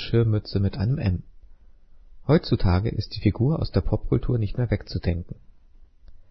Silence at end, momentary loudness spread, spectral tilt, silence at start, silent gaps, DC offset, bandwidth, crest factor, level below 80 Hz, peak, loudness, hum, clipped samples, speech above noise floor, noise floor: 0.1 s; 8 LU; -9.5 dB/octave; 0 s; none; under 0.1%; 6 kHz; 20 dB; -36 dBFS; -6 dBFS; -25 LUFS; none; under 0.1%; 27 dB; -50 dBFS